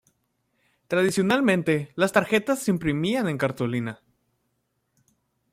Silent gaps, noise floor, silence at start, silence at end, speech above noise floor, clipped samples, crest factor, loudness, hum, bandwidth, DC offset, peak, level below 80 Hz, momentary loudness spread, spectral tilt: none; -74 dBFS; 0.9 s; 1.55 s; 51 dB; under 0.1%; 20 dB; -24 LUFS; none; 16 kHz; under 0.1%; -4 dBFS; -58 dBFS; 7 LU; -5.5 dB/octave